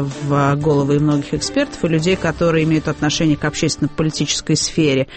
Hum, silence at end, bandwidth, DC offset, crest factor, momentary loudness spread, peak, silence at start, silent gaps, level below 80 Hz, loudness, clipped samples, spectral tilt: none; 0 s; 8.8 kHz; under 0.1%; 12 dB; 4 LU; -4 dBFS; 0 s; none; -40 dBFS; -17 LUFS; under 0.1%; -5 dB/octave